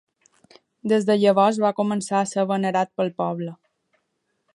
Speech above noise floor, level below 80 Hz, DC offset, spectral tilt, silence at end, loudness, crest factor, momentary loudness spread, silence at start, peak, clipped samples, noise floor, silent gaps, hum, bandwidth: 53 dB; -74 dBFS; under 0.1%; -5.5 dB/octave; 1 s; -22 LUFS; 18 dB; 10 LU; 0.85 s; -4 dBFS; under 0.1%; -74 dBFS; none; none; 11.5 kHz